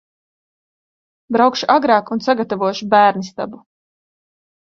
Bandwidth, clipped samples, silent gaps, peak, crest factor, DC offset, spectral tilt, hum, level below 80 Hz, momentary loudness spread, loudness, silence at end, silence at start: 7.4 kHz; under 0.1%; none; 0 dBFS; 18 dB; under 0.1%; -5 dB/octave; none; -64 dBFS; 13 LU; -16 LUFS; 1.1 s; 1.3 s